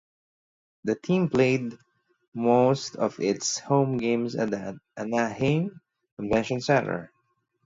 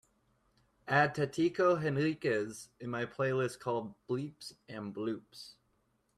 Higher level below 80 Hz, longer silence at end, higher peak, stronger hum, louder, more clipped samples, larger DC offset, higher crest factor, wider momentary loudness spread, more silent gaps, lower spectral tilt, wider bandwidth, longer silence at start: first, -58 dBFS vs -72 dBFS; about the same, 0.6 s vs 0.65 s; first, -8 dBFS vs -12 dBFS; neither; first, -26 LUFS vs -34 LUFS; neither; neither; about the same, 20 dB vs 22 dB; second, 13 LU vs 17 LU; first, 2.28-2.32 s, 6.12-6.17 s vs none; about the same, -5.5 dB/octave vs -6 dB/octave; second, 7.8 kHz vs 13.5 kHz; about the same, 0.85 s vs 0.85 s